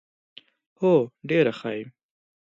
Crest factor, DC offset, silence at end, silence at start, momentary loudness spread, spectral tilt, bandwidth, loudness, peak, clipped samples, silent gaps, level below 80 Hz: 18 dB; under 0.1%; 0.65 s; 0.8 s; 13 LU; -8 dB/octave; 7.6 kHz; -24 LUFS; -8 dBFS; under 0.1%; none; -74 dBFS